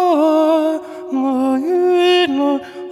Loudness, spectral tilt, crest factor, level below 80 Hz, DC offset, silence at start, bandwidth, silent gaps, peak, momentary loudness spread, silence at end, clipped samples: -16 LUFS; -4 dB/octave; 12 dB; -68 dBFS; under 0.1%; 0 s; 12.5 kHz; none; -2 dBFS; 9 LU; 0 s; under 0.1%